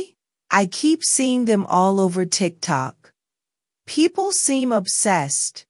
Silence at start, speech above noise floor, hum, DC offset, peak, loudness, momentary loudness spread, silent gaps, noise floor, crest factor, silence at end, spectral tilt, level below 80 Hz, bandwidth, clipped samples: 0 s; 68 dB; none; under 0.1%; -2 dBFS; -19 LUFS; 6 LU; none; -88 dBFS; 18 dB; 0.1 s; -3.5 dB/octave; -72 dBFS; 11.5 kHz; under 0.1%